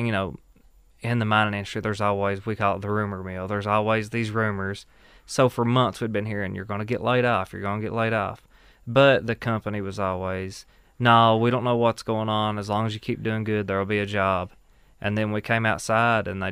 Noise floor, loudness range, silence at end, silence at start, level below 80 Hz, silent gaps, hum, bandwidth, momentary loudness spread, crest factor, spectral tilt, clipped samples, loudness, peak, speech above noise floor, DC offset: -55 dBFS; 4 LU; 0 s; 0 s; -54 dBFS; none; none; 15 kHz; 11 LU; 20 dB; -6 dB/octave; under 0.1%; -24 LUFS; -4 dBFS; 31 dB; under 0.1%